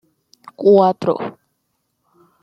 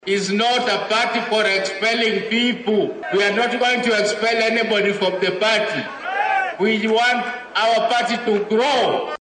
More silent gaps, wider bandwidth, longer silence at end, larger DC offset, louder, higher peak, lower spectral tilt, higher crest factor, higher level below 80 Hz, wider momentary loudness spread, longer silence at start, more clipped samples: neither; second, 6.2 kHz vs 9.4 kHz; first, 1.1 s vs 0.05 s; neither; first, -15 LUFS vs -18 LUFS; first, -2 dBFS vs -8 dBFS; first, -8.5 dB/octave vs -3.5 dB/octave; first, 18 dB vs 10 dB; about the same, -66 dBFS vs -66 dBFS; first, 13 LU vs 4 LU; first, 0.6 s vs 0.05 s; neither